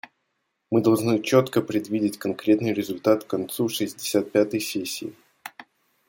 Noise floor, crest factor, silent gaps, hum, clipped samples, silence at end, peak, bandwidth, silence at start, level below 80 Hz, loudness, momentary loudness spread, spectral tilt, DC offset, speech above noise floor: -76 dBFS; 20 dB; none; none; under 0.1%; 0.45 s; -4 dBFS; 17 kHz; 0.7 s; -66 dBFS; -24 LUFS; 13 LU; -5.5 dB/octave; under 0.1%; 53 dB